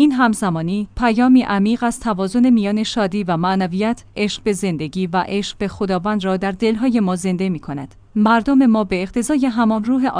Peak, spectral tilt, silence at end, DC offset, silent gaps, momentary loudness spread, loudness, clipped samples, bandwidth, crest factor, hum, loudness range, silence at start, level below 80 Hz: -4 dBFS; -6 dB/octave; 0 s; under 0.1%; none; 8 LU; -18 LUFS; under 0.1%; 10.5 kHz; 14 dB; none; 4 LU; 0 s; -44 dBFS